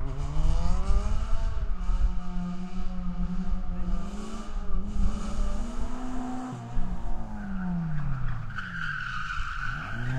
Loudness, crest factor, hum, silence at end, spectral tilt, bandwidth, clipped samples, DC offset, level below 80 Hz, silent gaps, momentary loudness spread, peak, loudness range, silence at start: -34 LUFS; 14 dB; none; 0 s; -6.5 dB/octave; 8.4 kHz; under 0.1%; under 0.1%; -28 dBFS; none; 6 LU; -10 dBFS; 3 LU; 0 s